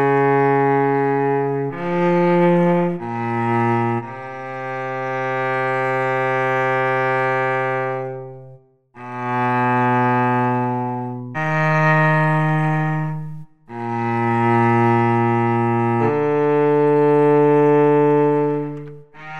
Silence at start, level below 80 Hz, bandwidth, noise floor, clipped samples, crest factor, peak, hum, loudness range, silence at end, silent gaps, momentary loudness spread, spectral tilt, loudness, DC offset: 0 s; -64 dBFS; 8.4 kHz; -46 dBFS; under 0.1%; 12 dB; -6 dBFS; none; 5 LU; 0 s; none; 13 LU; -9 dB/octave; -18 LUFS; 0.4%